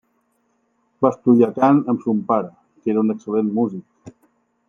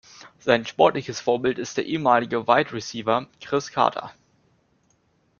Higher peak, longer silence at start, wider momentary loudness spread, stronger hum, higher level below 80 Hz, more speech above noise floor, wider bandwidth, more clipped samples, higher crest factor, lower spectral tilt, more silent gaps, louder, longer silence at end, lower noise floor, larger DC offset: about the same, -2 dBFS vs -2 dBFS; first, 1 s vs 0.25 s; about the same, 9 LU vs 8 LU; neither; about the same, -68 dBFS vs -64 dBFS; first, 49 dB vs 43 dB; about the same, 7 kHz vs 7.2 kHz; neither; about the same, 18 dB vs 22 dB; first, -9.5 dB/octave vs -4.5 dB/octave; neither; first, -19 LUFS vs -23 LUFS; second, 0.6 s vs 1.3 s; about the same, -66 dBFS vs -65 dBFS; neither